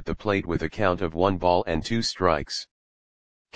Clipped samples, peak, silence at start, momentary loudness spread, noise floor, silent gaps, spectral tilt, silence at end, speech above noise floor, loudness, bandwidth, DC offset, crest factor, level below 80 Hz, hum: under 0.1%; -4 dBFS; 0 s; 8 LU; under -90 dBFS; 2.71-3.45 s; -5 dB/octave; 0 s; over 65 dB; -25 LUFS; 9.8 kHz; 1%; 22 dB; -44 dBFS; none